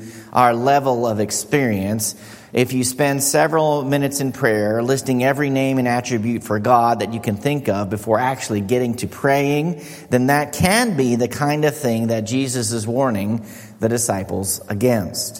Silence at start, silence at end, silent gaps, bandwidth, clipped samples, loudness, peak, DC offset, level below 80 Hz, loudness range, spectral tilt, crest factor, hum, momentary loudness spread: 0 s; 0 s; none; 16.5 kHz; under 0.1%; -19 LUFS; 0 dBFS; under 0.1%; -52 dBFS; 2 LU; -5 dB/octave; 18 dB; none; 7 LU